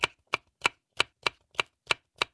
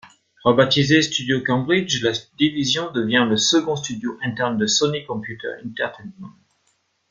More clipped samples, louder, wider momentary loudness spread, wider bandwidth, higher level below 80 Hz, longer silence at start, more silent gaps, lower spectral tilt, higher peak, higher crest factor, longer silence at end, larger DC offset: neither; second, -31 LUFS vs -20 LUFS; second, 5 LU vs 12 LU; first, 11 kHz vs 9.6 kHz; second, -64 dBFS vs -58 dBFS; about the same, 0 s vs 0.05 s; neither; second, -1 dB/octave vs -4 dB/octave; second, -10 dBFS vs -2 dBFS; first, 24 dB vs 18 dB; second, 0.1 s vs 0.8 s; neither